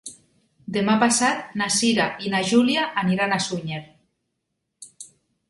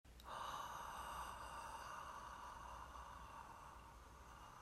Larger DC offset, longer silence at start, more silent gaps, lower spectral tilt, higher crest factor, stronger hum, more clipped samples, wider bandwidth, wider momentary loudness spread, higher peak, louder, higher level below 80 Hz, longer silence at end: neither; about the same, 0.05 s vs 0.05 s; neither; about the same, -3.5 dB/octave vs -3 dB/octave; about the same, 20 dB vs 16 dB; neither; neither; second, 11.5 kHz vs 16 kHz; first, 18 LU vs 10 LU; first, -4 dBFS vs -38 dBFS; first, -21 LUFS vs -53 LUFS; about the same, -62 dBFS vs -64 dBFS; first, 0.45 s vs 0 s